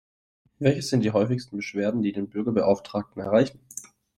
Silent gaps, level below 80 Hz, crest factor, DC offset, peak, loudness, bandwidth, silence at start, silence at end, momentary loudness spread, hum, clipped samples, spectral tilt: none; -62 dBFS; 18 dB; under 0.1%; -6 dBFS; -25 LUFS; 14.5 kHz; 0.6 s; 0.3 s; 9 LU; none; under 0.1%; -6.5 dB/octave